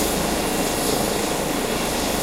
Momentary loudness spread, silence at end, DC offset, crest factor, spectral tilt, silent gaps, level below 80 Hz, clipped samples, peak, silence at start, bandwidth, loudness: 2 LU; 0 s; under 0.1%; 14 dB; -3 dB/octave; none; -36 dBFS; under 0.1%; -8 dBFS; 0 s; 16 kHz; -22 LUFS